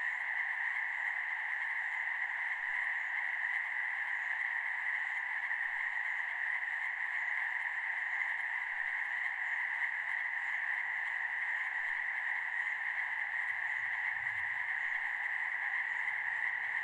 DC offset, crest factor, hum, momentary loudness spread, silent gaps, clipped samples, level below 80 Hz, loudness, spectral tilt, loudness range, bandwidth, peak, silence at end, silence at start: under 0.1%; 14 dB; none; 1 LU; none; under 0.1%; -80 dBFS; -34 LUFS; 0 dB/octave; 0 LU; 11.5 kHz; -22 dBFS; 0 s; 0 s